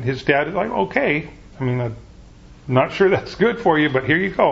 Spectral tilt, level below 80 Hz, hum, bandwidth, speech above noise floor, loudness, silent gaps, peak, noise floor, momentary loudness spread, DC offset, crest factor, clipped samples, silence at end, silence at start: -7.5 dB/octave; -46 dBFS; none; 7.6 kHz; 25 dB; -19 LUFS; none; 0 dBFS; -43 dBFS; 11 LU; under 0.1%; 20 dB; under 0.1%; 0 s; 0 s